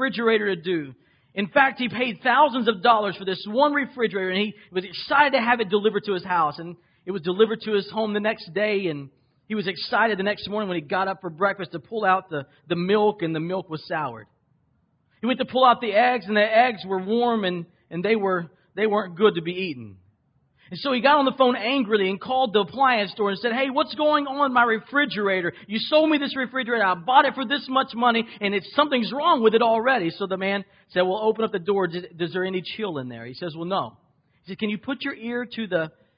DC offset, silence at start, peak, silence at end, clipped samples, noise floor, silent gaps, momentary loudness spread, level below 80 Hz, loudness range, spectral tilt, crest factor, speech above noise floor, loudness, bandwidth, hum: under 0.1%; 0 s; -4 dBFS; 0.3 s; under 0.1%; -67 dBFS; none; 11 LU; -66 dBFS; 5 LU; -9.5 dB/octave; 20 dB; 44 dB; -23 LUFS; 5.4 kHz; none